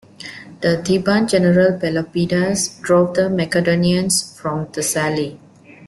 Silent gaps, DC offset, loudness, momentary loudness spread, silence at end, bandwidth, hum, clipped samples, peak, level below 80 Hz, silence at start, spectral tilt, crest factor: none; under 0.1%; -17 LUFS; 10 LU; 0 s; 12.5 kHz; none; under 0.1%; -2 dBFS; -52 dBFS; 0.2 s; -5 dB/octave; 16 dB